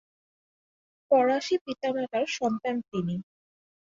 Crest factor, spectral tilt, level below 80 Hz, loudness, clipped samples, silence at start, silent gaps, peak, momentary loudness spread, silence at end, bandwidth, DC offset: 18 dB; -5.5 dB/octave; -70 dBFS; -28 LUFS; under 0.1%; 1.1 s; 1.61-1.65 s; -12 dBFS; 9 LU; 0.6 s; 7.6 kHz; under 0.1%